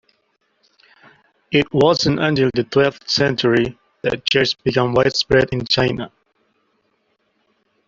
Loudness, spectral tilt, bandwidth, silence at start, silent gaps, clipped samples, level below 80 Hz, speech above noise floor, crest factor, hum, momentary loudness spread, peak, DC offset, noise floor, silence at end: -17 LUFS; -5 dB/octave; 7.6 kHz; 1.5 s; none; under 0.1%; -46 dBFS; 49 dB; 18 dB; none; 7 LU; -2 dBFS; under 0.1%; -66 dBFS; 1.8 s